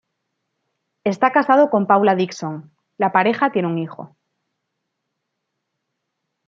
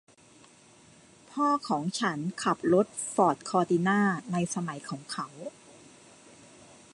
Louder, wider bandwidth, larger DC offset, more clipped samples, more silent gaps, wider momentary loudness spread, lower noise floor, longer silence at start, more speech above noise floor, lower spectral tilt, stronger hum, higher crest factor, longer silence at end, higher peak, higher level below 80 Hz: first, -18 LUFS vs -28 LUFS; second, 7.6 kHz vs 11.5 kHz; neither; neither; neither; about the same, 15 LU vs 13 LU; first, -77 dBFS vs -57 dBFS; second, 1.05 s vs 1.3 s; first, 60 dB vs 29 dB; first, -6.5 dB/octave vs -5 dB/octave; neither; about the same, 20 dB vs 20 dB; first, 2.4 s vs 1.45 s; first, -2 dBFS vs -10 dBFS; about the same, -72 dBFS vs -72 dBFS